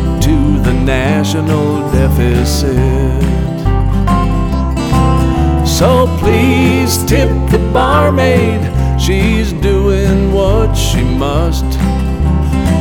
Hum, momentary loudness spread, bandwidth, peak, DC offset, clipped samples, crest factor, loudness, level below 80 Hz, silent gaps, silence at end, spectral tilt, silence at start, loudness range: none; 5 LU; 18.5 kHz; -2 dBFS; under 0.1%; under 0.1%; 10 dB; -12 LUFS; -16 dBFS; none; 0 s; -6 dB/octave; 0 s; 2 LU